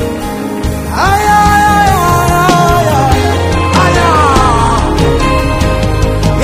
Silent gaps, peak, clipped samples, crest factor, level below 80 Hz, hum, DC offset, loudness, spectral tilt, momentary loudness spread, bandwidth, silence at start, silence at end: none; 0 dBFS; 0.4%; 8 dB; -18 dBFS; none; under 0.1%; -9 LUFS; -5.5 dB/octave; 8 LU; 16 kHz; 0 s; 0 s